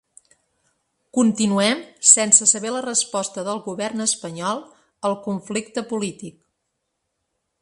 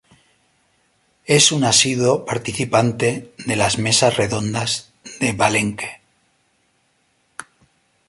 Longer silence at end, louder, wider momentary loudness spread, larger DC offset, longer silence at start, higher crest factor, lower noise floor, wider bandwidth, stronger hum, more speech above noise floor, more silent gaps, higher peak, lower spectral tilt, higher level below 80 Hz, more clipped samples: first, 1.3 s vs 0.65 s; about the same, -19 LUFS vs -17 LUFS; second, 14 LU vs 22 LU; neither; second, 1.15 s vs 1.3 s; about the same, 22 dB vs 20 dB; first, -76 dBFS vs -64 dBFS; about the same, 11.5 kHz vs 12 kHz; neither; first, 55 dB vs 46 dB; neither; about the same, 0 dBFS vs 0 dBFS; about the same, -2.5 dB/octave vs -3 dB/octave; second, -68 dBFS vs -52 dBFS; neither